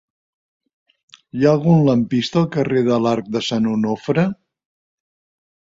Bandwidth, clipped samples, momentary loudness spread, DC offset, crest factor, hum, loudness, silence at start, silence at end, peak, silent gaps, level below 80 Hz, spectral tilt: 7.8 kHz; under 0.1%; 7 LU; under 0.1%; 18 dB; none; -18 LUFS; 1.35 s; 1.45 s; -2 dBFS; none; -56 dBFS; -7 dB/octave